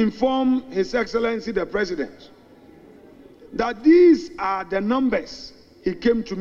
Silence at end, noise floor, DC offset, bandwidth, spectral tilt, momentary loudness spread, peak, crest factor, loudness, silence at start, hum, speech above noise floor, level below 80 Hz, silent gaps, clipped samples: 0 s; -48 dBFS; under 0.1%; 7.2 kHz; -6 dB/octave; 15 LU; -6 dBFS; 16 dB; -21 LUFS; 0 s; none; 27 dB; -48 dBFS; none; under 0.1%